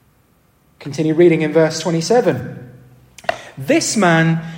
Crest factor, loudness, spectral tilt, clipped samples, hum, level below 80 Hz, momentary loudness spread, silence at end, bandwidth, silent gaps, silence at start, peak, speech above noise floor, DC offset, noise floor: 16 dB; -16 LUFS; -5 dB/octave; under 0.1%; none; -58 dBFS; 16 LU; 0 s; 16.5 kHz; none; 0.8 s; -2 dBFS; 41 dB; under 0.1%; -56 dBFS